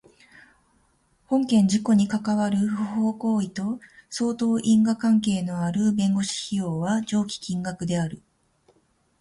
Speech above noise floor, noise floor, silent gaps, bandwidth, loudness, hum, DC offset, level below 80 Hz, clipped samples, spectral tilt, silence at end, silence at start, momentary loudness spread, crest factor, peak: 42 dB; -65 dBFS; none; 11.5 kHz; -24 LUFS; none; under 0.1%; -60 dBFS; under 0.1%; -6 dB/octave; 1.05 s; 1.3 s; 9 LU; 14 dB; -10 dBFS